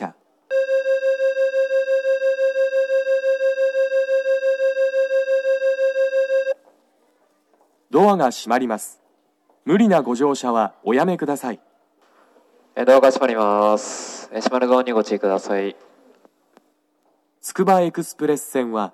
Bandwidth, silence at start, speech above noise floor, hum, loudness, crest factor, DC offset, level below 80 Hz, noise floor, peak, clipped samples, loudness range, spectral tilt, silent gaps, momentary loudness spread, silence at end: 13 kHz; 0 s; 46 dB; none; -19 LUFS; 18 dB; under 0.1%; under -90 dBFS; -64 dBFS; -2 dBFS; under 0.1%; 4 LU; -5 dB/octave; none; 10 LU; 0.05 s